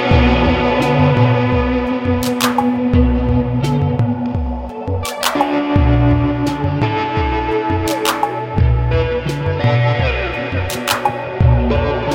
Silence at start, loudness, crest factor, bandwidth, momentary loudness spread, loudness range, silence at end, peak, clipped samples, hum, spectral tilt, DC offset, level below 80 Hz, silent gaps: 0 s; -16 LUFS; 14 dB; 16.5 kHz; 7 LU; 2 LU; 0 s; 0 dBFS; under 0.1%; none; -6.5 dB/octave; under 0.1%; -24 dBFS; none